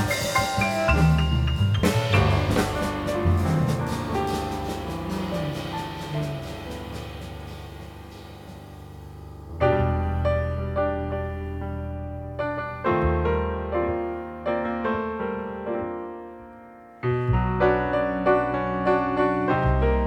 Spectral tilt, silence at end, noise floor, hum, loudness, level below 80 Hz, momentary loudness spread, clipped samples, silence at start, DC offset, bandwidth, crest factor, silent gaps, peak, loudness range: -6.5 dB/octave; 0 s; -45 dBFS; none; -25 LUFS; -34 dBFS; 18 LU; under 0.1%; 0 s; under 0.1%; 18.5 kHz; 18 dB; none; -6 dBFS; 10 LU